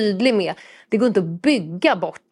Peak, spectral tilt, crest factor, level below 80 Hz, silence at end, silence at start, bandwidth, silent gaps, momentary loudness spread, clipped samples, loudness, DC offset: -2 dBFS; -6 dB/octave; 18 dB; -68 dBFS; 0.15 s; 0 s; 11.5 kHz; none; 7 LU; under 0.1%; -20 LUFS; under 0.1%